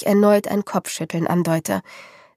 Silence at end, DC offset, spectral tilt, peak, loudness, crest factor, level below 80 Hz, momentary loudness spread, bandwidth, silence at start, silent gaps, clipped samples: 0.3 s; under 0.1%; -6 dB/octave; -4 dBFS; -20 LUFS; 16 dB; -64 dBFS; 10 LU; 15.5 kHz; 0 s; none; under 0.1%